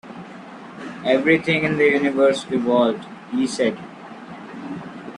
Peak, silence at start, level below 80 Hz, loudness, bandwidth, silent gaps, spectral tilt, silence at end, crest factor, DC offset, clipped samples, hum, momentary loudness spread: -4 dBFS; 0.05 s; -62 dBFS; -19 LUFS; 11 kHz; none; -5.5 dB/octave; 0 s; 18 dB; under 0.1%; under 0.1%; none; 20 LU